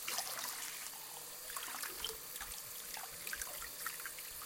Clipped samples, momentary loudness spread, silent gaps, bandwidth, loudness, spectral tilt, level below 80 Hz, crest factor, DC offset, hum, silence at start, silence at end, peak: under 0.1%; 4 LU; none; 17 kHz; -43 LUFS; 1 dB/octave; -68 dBFS; 22 dB; under 0.1%; none; 0 s; 0 s; -22 dBFS